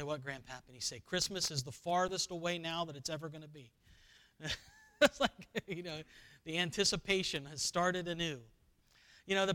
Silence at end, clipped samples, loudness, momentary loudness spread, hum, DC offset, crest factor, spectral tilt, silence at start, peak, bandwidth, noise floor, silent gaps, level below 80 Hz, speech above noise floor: 0 s; under 0.1%; -36 LUFS; 16 LU; none; under 0.1%; 24 dB; -3 dB/octave; 0 s; -14 dBFS; 19 kHz; -69 dBFS; none; -64 dBFS; 31 dB